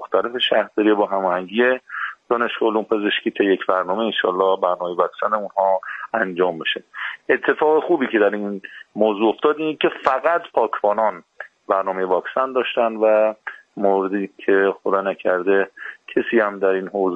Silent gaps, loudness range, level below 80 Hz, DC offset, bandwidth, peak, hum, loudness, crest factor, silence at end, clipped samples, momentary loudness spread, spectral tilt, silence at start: none; 1 LU; -68 dBFS; under 0.1%; 6.4 kHz; 0 dBFS; none; -20 LUFS; 20 dB; 0 s; under 0.1%; 7 LU; -6.5 dB/octave; 0 s